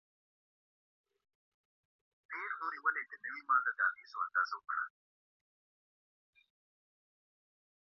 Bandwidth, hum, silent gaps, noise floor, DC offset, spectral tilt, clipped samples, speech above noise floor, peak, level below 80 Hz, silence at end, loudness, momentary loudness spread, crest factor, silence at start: 6.2 kHz; none; none; under -90 dBFS; under 0.1%; 4 dB/octave; under 0.1%; over 53 dB; -18 dBFS; under -90 dBFS; 3.1 s; -36 LUFS; 11 LU; 24 dB; 2.3 s